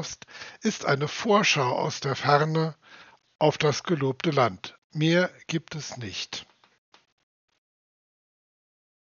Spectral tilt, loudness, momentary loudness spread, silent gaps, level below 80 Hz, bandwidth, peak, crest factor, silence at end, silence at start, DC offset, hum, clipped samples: -4 dB/octave; -25 LUFS; 14 LU; 4.78-4.90 s; -70 dBFS; 7.2 kHz; -4 dBFS; 24 dB; 2.6 s; 0 s; under 0.1%; none; under 0.1%